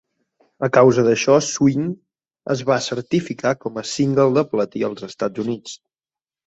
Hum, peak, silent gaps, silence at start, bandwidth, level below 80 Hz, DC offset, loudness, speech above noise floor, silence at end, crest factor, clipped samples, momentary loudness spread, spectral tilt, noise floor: none; -2 dBFS; none; 0.6 s; 8.2 kHz; -60 dBFS; under 0.1%; -19 LUFS; over 72 dB; 0.7 s; 18 dB; under 0.1%; 13 LU; -5.5 dB/octave; under -90 dBFS